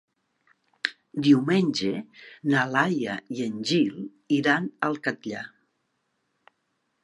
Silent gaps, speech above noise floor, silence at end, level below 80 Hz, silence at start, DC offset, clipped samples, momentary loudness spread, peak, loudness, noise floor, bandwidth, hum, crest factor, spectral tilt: none; 50 dB; 1.6 s; -74 dBFS; 0.85 s; under 0.1%; under 0.1%; 14 LU; -4 dBFS; -25 LUFS; -75 dBFS; 11.5 kHz; none; 22 dB; -5.5 dB/octave